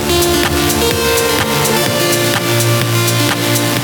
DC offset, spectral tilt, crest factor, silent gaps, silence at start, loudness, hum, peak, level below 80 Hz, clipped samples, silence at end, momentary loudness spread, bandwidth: under 0.1%; -3.5 dB/octave; 12 dB; none; 0 s; -12 LUFS; none; 0 dBFS; -32 dBFS; under 0.1%; 0 s; 1 LU; over 20 kHz